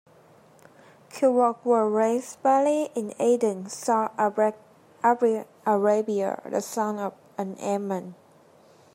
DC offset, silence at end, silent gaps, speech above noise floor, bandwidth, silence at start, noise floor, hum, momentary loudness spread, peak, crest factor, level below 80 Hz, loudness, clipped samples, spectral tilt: under 0.1%; 0.8 s; none; 31 dB; 16 kHz; 1.15 s; -56 dBFS; none; 10 LU; -8 dBFS; 18 dB; -82 dBFS; -25 LUFS; under 0.1%; -5.5 dB/octave